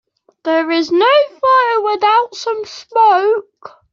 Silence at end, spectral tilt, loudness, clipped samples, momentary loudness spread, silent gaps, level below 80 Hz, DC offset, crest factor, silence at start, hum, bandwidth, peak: 0.25 s; -2.5 dB/octave; -14 LUFS; under 0.1%; 10 LU; none; -66 dBFS; under 0.1%; 12 dB; 0.45 s; none; 7.4 kHz; -2 dBFS